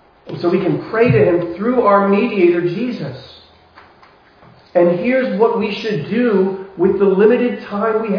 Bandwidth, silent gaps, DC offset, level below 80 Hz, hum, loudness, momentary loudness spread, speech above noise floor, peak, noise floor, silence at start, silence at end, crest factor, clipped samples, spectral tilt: 5.4 kHz; none; under 0.1%; -52 dBFS; none; -15 LUFS; 9 LU; 33 dB; 0 dBFS; -47 dBFS; 0.25 s; 0 s; 16 dB; under 0.1%; -9 dB/octave